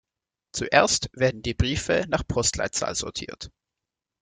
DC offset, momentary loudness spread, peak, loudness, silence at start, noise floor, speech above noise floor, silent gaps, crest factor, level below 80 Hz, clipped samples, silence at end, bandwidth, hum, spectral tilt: under 0.1%; 15 LU; -2 dBFS; -24 LUFS; 0.55 s; -88 dBFS; 63 dB; none; 24 dB; -42 dBFS; under 0.1%; 0.75 s; 9.8 kHz; none; -3.5 dB/octave